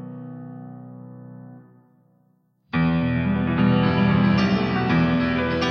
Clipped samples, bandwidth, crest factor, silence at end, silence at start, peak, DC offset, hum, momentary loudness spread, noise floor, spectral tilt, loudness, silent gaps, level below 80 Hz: under 0.1%; 6.6 kHz; 16 dB; 0 s; 0 s; -8 dBFS; under 0.1%; none; 22 LU; -63 dBFS; -8 dB/octave; -21 LUFS; none; -44 dBFS